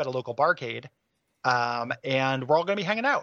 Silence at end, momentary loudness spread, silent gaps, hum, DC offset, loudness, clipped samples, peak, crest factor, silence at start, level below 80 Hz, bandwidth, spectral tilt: 0 s; 7 LU; none; none; under 0.1%; -26 LUFS; under 0.1%; -8 dBFS; 20 dB; 0 s; -76 dBFS; 7.6 kHz; -5.5 dB/octave